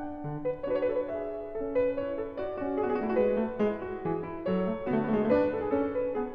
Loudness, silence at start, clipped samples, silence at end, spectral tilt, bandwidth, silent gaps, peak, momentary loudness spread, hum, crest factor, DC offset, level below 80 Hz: -30 LUFS; 0 s; under 0.1%; 0 s; -10 dB/octave; 5.2 kHz; none; -12 dBFS; 8 LU; none; 16 dB; under 0.1%; -54 dBFS